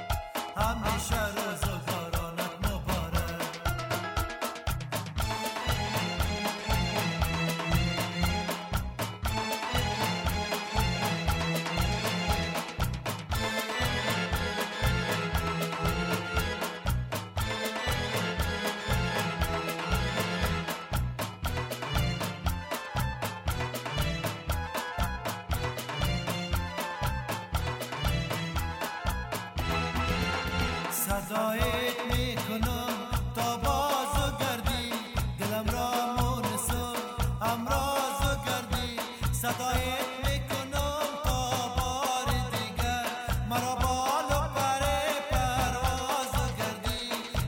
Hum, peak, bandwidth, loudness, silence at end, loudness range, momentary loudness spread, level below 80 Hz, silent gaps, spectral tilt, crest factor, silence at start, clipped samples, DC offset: none; -14 dBFS; 17.5 kHz; -31 LUFS; 0 s; 3 LU; 5 LU; -38 dBFS; none; -4 dB/octave; 18 dB; 0 s; under 0.1%; under 0.1%